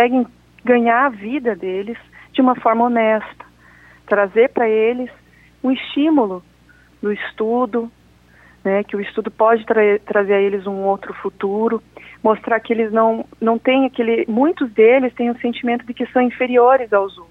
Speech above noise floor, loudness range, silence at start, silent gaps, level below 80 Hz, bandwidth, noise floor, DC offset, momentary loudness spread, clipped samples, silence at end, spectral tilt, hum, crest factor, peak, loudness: 33 dB; 5 LU; 0 s; none; -58 dBFS; 4.2 kHz; -50 dBFS; under 0.1%; 11 LU; under 0.1%; 0.05 s; -7.5 dB/octave; 60 Hz at -55 dBFS; 14 dB; -2 dBFS; -17 LUFS